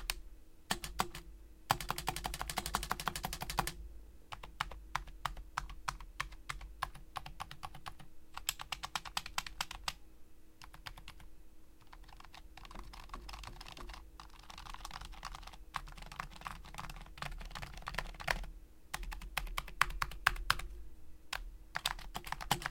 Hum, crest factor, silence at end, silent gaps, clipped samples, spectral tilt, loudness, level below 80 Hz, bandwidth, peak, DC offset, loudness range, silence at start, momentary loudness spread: none; 36 dB; 0 s; none; under 0.1%; -2 dB/octave; -42 LUFS; -50 dBFS; 17 kHz; -6 dBFS; under 0.1%; 13 LU; 0 s; 19 LU